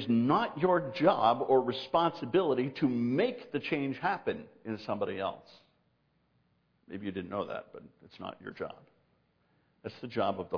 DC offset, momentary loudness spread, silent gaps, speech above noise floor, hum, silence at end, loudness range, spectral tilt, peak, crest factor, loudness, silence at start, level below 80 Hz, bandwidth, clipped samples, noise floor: under 0.1%; 16 LU; none; 42 dB; none; 0 s; 14 LU; -8 dB/octave; -12 dBFS; 20 dB; -31 LUFS; 0 s; -74 dBFS; 5.4 kHz; under 0.1%; -73 dBFS